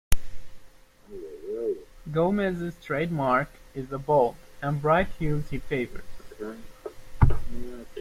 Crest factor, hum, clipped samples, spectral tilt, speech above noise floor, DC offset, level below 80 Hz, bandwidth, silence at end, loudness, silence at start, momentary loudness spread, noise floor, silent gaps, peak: 22 dB; none; under 0.1%; -7 dB/octave; 23 dB; under 0.1%; -36 dBFS; 16 kHz; 0 s; -27 LUFS; 0.1 s; 18 LU; -50 dBFS; none; -4 dBFS